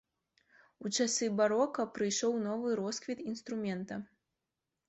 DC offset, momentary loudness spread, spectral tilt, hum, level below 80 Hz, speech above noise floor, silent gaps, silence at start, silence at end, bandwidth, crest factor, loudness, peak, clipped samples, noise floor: under 0.1%; 10 LU; -3.5 dB/octave; none; -76 dBFS; 55 dB; none; 0.8 s; 0.85 s; 8.2 kHz; 18 dB; -34 LUFS; -18 dBFS; under 0.1%; -88 dBFS